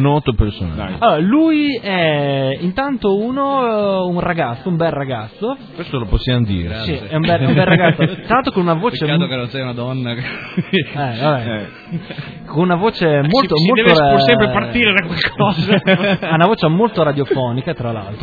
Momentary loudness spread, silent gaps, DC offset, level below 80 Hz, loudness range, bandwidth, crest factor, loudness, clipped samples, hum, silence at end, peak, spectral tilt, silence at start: 11 LU; none; under 0.1%; -34 dBFS; 6 LU; 5 kHz; 16 dB; -16 LUFS; under 0.1%; none; 0 s; 0 dBFS; -8.5 dB/octave; 0 s